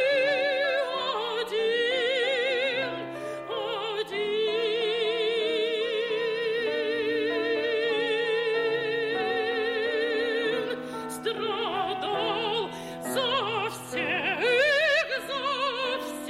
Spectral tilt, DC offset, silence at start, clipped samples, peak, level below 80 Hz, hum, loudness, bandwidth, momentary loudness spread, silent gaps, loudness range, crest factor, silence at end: -3 dB/octave; under 0.1%; 0 s; under 0.1%; -12 dBFS; -68 dBFS; none; -27 LUFS; 15 kHz; 7 LU; none; 3 LU; 16 dB; 0 s